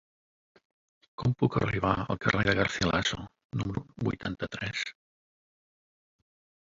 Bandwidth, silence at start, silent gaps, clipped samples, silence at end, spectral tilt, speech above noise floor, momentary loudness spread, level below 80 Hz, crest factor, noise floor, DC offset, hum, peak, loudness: 7.8 kHz; 1.2 s; 3.45-3.50 s; under 0.1%; 1.75 s; -5.5 dB/octave; over 61 dB; 9 LU; -50 dBFS; 26 dB; under -90 dBFS; under 0.1%; none; -6 dBFS; -30 LUFS